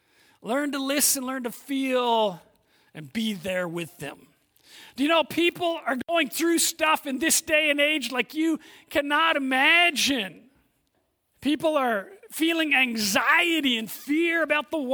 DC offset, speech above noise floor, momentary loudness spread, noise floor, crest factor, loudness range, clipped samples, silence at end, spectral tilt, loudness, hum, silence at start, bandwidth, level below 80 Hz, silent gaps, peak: under 0.1%; 48 dB; 12 LU; -72 dBFS; 18 dB; 7 LU; under 0.1%; 0 s; -2 dB/octave; -23 LUFS; none; 0.45 s; over 20 kHz; -66 dBFS; none; -6 dBFS